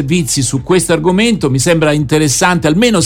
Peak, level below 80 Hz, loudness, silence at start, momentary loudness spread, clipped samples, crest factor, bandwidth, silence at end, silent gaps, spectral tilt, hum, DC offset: 0 dBFS; -36 dBFS; -11 LUFS; 0 s; 3 LU; under 0.1%; 10 dB; 18 kHz; 0 s; none; -4.5 dB/octave; none; under 0.1%